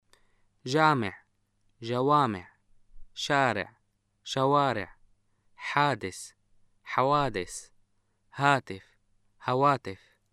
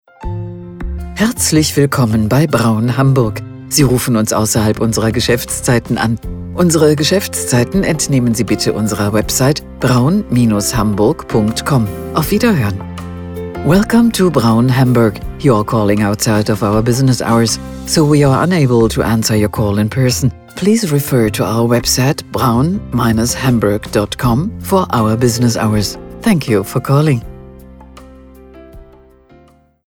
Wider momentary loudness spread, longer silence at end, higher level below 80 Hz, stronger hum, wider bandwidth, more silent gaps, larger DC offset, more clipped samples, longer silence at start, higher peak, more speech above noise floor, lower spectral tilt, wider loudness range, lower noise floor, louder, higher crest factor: first, 19 LU vs 7 LU; second, 0.35 s vs 1.05 s; second, -60 dBFS vs -32 dBFS; neither; second, 13.5 kHz vs 19 kHz; neither; neither; neither; first, 0.65 s vs 0.2 s; second, -8 dBFS vs 0 dBFS; first, 46 dB vs 34 dB; about the same, -5 dB/octave vs -5.5 dB/octave; about the same, 2 LU vs 2 LU; first, -73 dBFS vs -47 dBFS; second, -27 LUFS vs -13 LUFS; first, 22 dB vs 14 dB